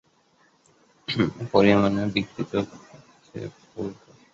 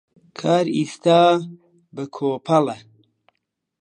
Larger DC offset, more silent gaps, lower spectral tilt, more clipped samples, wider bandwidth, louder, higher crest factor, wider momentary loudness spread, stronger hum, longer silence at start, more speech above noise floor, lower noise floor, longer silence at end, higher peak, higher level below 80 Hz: neither; neither; about the same, -7 dB/octave vs -6 dB/octave; neither; second, 7.6 kHz vs 10.5 kHz; second, -24 LUFS vs -19 LUFS; about the same, 22 dB vs 18 dB; second, 19 LU vs 22 LU; neither; first, 1.1 s vs 0.4 s; second, 39 dB vs 58 dB; second, -62 dBFS vs -77 dBFS; second, 0.4 s vs 1.05 s; about the same, -4 dBFS vs -4 dBFS; first, -54 dBFS vs -72 dBFS